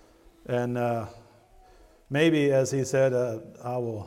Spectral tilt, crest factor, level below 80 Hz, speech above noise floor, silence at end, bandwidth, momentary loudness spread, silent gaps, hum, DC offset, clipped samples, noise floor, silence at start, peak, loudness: -6 dB/octave; 18 dB; -60 dBFS; 30 dB; 0 s; 15.5 kHz; 12 LU; none; none; under 0.1%; under 0.1%; -55 dBFS; 0.5 s; -10 dBFS; -26 LUFS